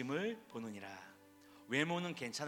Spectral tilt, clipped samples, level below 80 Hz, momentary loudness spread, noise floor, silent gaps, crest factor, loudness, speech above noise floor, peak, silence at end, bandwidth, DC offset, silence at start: -4.5 dB/octave; under 0.1%; -86 dBFS; 19 LU; -62 dBFS; none; 22 dB; -41 LUFS; 21 dB; -20 dBFS; 0 s; 18.5 kHz; under 0.1%; 0 s